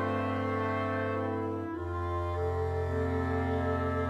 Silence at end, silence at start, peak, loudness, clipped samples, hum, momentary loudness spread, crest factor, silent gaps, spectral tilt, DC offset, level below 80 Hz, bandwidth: 0 s; 0 s; -20 dBFS; -32 LUFS; under 0.1%; none; 4 LU; 12 dB; none; -8.5 dB/octave; under 0.1%; -46 dBFS; 8 kHz